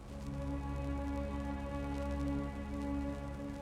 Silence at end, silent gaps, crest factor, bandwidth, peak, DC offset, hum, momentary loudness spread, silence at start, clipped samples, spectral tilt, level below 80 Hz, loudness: 0 s; none; 14 dB; 12 kHz; -26 dBFS; under 0.1%; none; 4 LU; 0 s; under 0.1%; -7.5 dB/octave; -44 dBFS; -40 LUFS